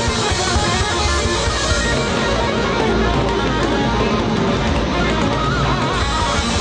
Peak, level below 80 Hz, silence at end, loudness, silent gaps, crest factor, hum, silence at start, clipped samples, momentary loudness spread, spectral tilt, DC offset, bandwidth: -6 dBFS; -26 dBFS; 0 s; -17 LUFS; none; 12 dB; none; 0 s; under 0.1%; 1 LU; -4.5 dB/octave; under 0.1%; 10.5 kHz